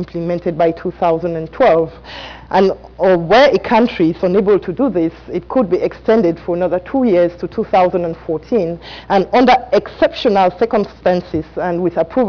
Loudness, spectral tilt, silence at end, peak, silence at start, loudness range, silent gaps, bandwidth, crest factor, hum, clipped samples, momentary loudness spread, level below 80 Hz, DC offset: -15 LUFS; -7.5 dB/octave; 0 s; -4 dBFS; 0 s; 2 LU; none; 5.4 kHz; 10 dB; none; under 0.1%; 10 LU; -42 dBFS; under 0.1%